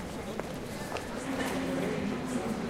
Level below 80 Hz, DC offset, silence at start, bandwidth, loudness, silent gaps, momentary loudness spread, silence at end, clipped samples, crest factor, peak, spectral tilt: -52 dBFS; under 0.1%; 0 s; 16 kHz; -35 LUFS; none; 6 LU; 0 s; under 0.1%; 16 dB; -18 dBFS; -5 dB/octave